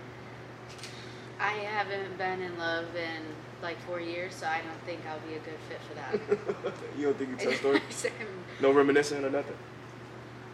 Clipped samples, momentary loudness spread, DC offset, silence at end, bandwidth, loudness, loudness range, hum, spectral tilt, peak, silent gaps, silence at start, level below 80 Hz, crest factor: under 0.1%; 18 LU; under 0.1%; 0 s; 12.5 kHz; -32 LUFS; 7 LU; none; -4.5 dB/octave; -10 dBFS; none; 0 s; -68 dBFS; 22 dB